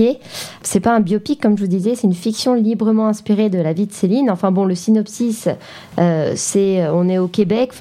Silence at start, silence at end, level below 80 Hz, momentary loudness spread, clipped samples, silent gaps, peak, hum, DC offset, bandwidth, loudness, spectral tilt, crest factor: 0 s; 0 s; -56 dBFS; 5 LU; under 0.1%; none; -2 dBFS; none; under 0.1%; 15 kHz; -17 LUFS; -6 dB/octave; 14 dB